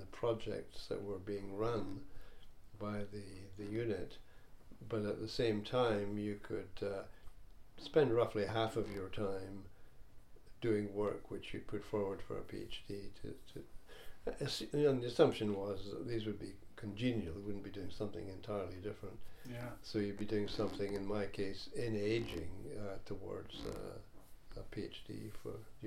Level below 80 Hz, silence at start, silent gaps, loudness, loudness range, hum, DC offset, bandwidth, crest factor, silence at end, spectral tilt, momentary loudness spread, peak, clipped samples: -58 dBFS; 0 s; none; -41 LUFS; 7 LU; none; under 0.1%; 16 kHz; 26 dB; 0 s; -6.5 dB/octave; 17 LU; -16 dBFS; under 0.1%